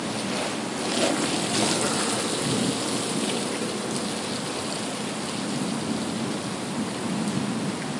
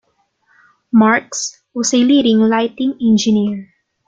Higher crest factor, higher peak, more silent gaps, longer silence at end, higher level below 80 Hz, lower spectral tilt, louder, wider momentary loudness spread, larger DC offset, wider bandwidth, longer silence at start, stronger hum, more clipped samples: first, 20 dB vs 14 dB; second, -8 dBFS vs -2 dBFS; neither; second, 0 s vs 0.45 s; second, -66 dBFS vs -56 dBFS; about the same, -3.5 dB/octave vs -4 dB/octave; second, -26 LUFS vs -14 LUFS; second, 6 LU vs 11 LU; neither; first, 11.5 kHz vs 9 kHz; second, 0 s vs 0.95 s; neither; neither